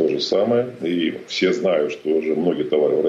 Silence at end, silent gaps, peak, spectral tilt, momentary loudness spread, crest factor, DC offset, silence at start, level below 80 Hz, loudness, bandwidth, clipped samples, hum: 0 s; none; -6 dBFS; -5.5 dB/octave; 4 LU; 12 dB; under 0.1%; 0 s; -66 dBFS; -20 LUFS; 7.8 kHz; under 0.1%; none